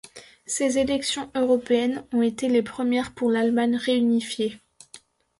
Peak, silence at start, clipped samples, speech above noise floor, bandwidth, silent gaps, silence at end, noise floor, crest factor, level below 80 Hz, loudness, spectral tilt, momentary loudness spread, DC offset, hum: -10 dBFS; 0.15 s; under 0.1%; 28 dB; 11.5 kHz; none; 0.45 s; -51 dBFS; 14 dB; -58 dBFS; -24 LUFS; -3.5 dB/octave; 6 LU; under 0.1%; none